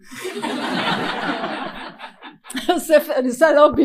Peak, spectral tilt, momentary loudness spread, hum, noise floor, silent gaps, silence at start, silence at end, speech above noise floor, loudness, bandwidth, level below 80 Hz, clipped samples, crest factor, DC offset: 0 dBFS; -4 dB/octave; 18 LU; none; -39 dBFS; none; 0.05 s; 0 s; 24 dB; -19 LUFS; 15.5 kHz; -52 dBFS; under 0.1%; 18 dB; under 0.1%